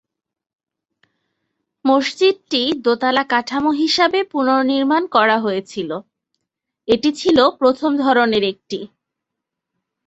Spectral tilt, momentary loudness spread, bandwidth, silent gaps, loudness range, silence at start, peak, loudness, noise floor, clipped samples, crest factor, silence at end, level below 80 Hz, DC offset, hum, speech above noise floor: -4 dB/octave; 11 LU; 8.2 kHz; none; 2 LU; 1.85 s; -2 dBFS; -17 LUFS; -81 dBFS; under 0.1%; 18 dB; 1.2 s; -58 dBFS; under 0.1%; none; 65 dB